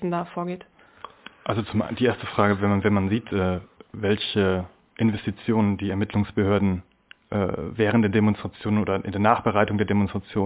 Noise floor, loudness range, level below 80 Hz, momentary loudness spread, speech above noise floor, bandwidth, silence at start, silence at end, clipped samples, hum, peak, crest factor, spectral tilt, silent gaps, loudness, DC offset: -45 dBFS; 2 LU; -46 dBFS; 10 LU; 22 dB; 4 kHz; 0 s; 0 s; under 0.1%; none; -4 dBFS; 20 dB; -11 dB/octave; none; -24 LUFS; under 0.1%